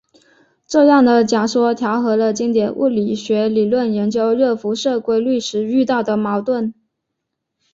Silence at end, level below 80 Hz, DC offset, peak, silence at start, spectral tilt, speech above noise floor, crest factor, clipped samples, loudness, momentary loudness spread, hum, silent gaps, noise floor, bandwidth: 1 s; -60 dBFS; under 0.1%; -2 dBFS; 0.7 s; -5.5 dB/octave; 61 dB; 14 dB; under 0.1%; -16 LUFS; 7 LU; none; none; -77 dBFS; 7.8 kHz